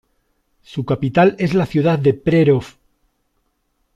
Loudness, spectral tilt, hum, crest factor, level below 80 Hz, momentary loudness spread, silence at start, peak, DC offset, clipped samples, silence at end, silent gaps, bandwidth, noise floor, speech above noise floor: -16 LUFS; -8.5 dB/octave; none; 16 dB; -48 dBFS; 8 LU; 0.7 s; -2 dBFS; under 0.1%; under 0.1%; 1.25 s; none; 10 kHz; -67 dBFS; 52 dB